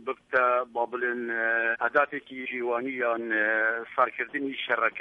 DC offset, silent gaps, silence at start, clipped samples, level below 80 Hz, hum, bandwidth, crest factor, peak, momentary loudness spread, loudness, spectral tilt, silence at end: under 0.1%; none; 0 s; under 0.1%; -74 dBFS; none; 6 kHz; 18 dB; -10 dBFS; 7 LU; -27 LUFS; -5.5 dB/octave; 0 s